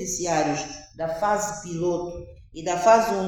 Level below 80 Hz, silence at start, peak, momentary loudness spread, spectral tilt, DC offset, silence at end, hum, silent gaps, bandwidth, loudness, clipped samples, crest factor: -50 dBFS; 0 s; -6 dBFS; 17 LU; -4 dB/octave; under 0.1%; 0 s; none; none; 18 kHz; -24 LUFS; under 0.1%; 20 dB